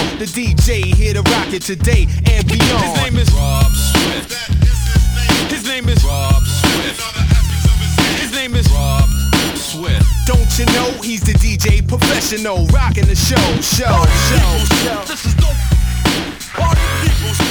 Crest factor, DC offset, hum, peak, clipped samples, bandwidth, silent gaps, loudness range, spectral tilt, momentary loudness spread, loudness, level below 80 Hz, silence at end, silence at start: 12 dB; under 0.1%; none; 0 dBFS; under 0.1%; over 20 kHz; none; 2 LU; -4.5 dB/octave; 5 LU; -14 LUFS; -16 dBFS; 0 s; 0 s